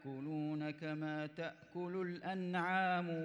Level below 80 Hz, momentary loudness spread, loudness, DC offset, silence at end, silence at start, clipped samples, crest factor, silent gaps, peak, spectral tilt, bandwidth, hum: -86 dBFS; 10 LU; -41 LUFS; under 0.1%; 0 s; 0 s; under 0.1%; 16 dB; none; -26 dBFS; -7.5 dB/octave; 10.5 kHz; none